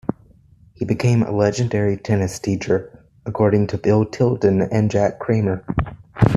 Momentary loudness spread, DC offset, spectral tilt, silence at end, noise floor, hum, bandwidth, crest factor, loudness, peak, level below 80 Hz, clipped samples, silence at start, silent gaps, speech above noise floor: 8 LU; under 0.1%; -7.5 dB/octave; 0 s; -50 dBFS; none; 12 kHz; 18 dB; -19 LUFS; -2 dBFS; -40 dBFS; under 0.1%; 0.05 s; none; 32 dB